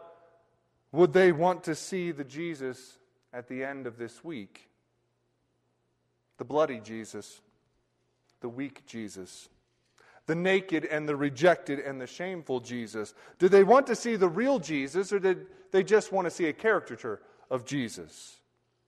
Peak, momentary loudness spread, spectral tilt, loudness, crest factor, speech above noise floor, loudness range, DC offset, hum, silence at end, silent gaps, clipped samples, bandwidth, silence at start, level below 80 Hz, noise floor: -10 dBFS; 20 LU; -5.5 dB/octave; -28 LUFS; 20 dB; 47 dB; 16 LU; under 0.1%; none; 0.6 s; none; under 0.1%; 12 kHz; 0 s; -74 dBFS; -75 dBFS